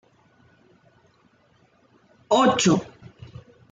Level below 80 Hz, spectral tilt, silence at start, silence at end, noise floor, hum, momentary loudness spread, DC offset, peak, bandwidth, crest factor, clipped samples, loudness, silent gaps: -62 dBFS; -4.5 dB/octave; 2.3 s; 0.9 s; -61 dBFS; none; 27 LU; under 0.1%; -6 dBFS; 9.6 kHz; 20 dB; under 0.1%; -20 LUFS; none